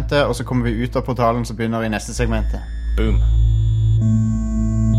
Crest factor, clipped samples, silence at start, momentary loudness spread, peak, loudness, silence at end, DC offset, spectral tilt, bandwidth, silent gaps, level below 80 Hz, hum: 14 dB; under 0.1%; 0 s; 6 LU; -4 dBFS; -19 LUFS; 0 s; under 0.1%; -7 dB/octave; 12 kHz; none; -22 dBFS; none